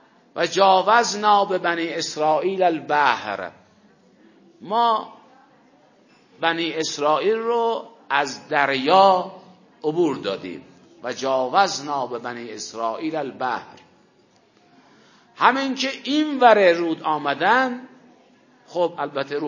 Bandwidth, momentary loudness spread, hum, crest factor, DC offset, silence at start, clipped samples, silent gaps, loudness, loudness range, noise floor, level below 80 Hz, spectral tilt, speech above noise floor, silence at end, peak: 7.4 kHz; 15 LU; none; 22 dB; under 0.1%; 0.35 s; under 0.1%; none; -21 LUFS; 7 LU; -58 dBFS; -74 dBFS; -3.5 dB/octave; 37 dB; 0 s; 0 dBFS